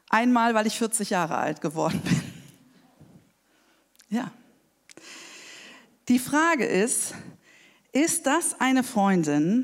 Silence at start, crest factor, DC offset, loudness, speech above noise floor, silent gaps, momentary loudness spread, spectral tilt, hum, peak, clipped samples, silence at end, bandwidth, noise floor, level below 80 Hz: 0.1 s; 20 dB; under 0.1%; -24 LUFS; 40 dB; none; 21 LU; -4 dB/octave; none; -6 dBFS; under 0.1%; 0 s; 16 kHz; -64 dBFS; -68 dBFS